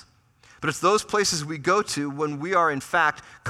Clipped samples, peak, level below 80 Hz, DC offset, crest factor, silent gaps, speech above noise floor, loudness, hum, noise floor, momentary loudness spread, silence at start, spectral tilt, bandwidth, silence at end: under 0.1%; -8 dBFS; -60 dBFS; under 0.1%; 18 dB; none; 33 dB; -23 LUFS; none; -57 dBFS; 7 LU; 0.6 s; -3.5 dB/octave; 15 kHz; 0 s